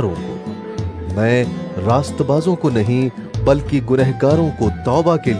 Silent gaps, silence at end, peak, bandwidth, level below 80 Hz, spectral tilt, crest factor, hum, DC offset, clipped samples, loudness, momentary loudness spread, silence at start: none; 0 s; -2 dBFS; 11 kHz; -36 dBFS; -7.5 dB/octave; 16 dB; none; under 0.1%; under 0.1%; -17 LUFS; 11 LU; 0 s